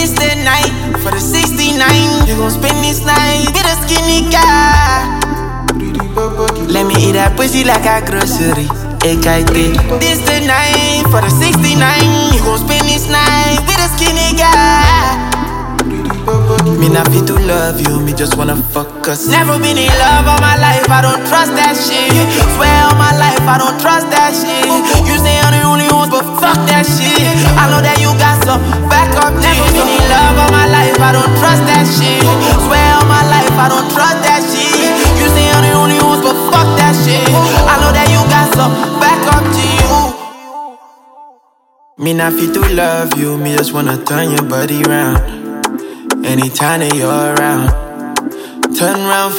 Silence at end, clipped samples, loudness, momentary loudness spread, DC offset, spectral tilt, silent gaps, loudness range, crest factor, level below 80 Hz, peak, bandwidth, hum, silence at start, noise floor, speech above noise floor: 0 s; under 0.1%; -10 LUFS; 8 LU; under 0.1%; -4 dB/octave; none; 5 LU; 10 dB; -20 dBFS; 0 dBFS; 17 kHz; none; 0 s; -50 dBFS; 41 dB